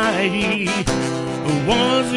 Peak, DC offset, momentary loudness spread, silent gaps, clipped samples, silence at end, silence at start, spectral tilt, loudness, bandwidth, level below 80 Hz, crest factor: -4 dBFS; under 0.1%; 6 LU; none; under 0.1%; 0 s; 0 s; -4.5 dB/octave; -19 LUFS; 11.5 kHz; -40 dBFS; 14 dB